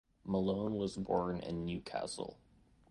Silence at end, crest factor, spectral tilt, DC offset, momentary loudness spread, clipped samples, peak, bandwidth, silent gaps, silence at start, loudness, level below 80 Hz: 0.55 s; 20 dB; -6.5 dB/octave; under 0.1%; 7 LU; under 0.1%; -20 dBFS; 11 kHz; none; 0.25 s; -38 LUFS; -60 dBFS